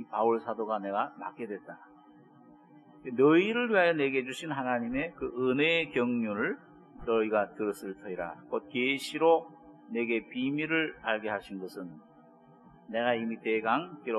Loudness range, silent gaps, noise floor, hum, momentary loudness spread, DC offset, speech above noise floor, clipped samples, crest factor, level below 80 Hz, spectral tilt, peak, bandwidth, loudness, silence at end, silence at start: 6 LU; none; -57 dBFS; none; 15 LU; under 0.1%; 27 dB; under 0.1%; 20 dB; -66 dBFS; -5.5 dB/octave; -10 dBFS; 11.5 kHz; -30 LUFS; 0 s; 0 s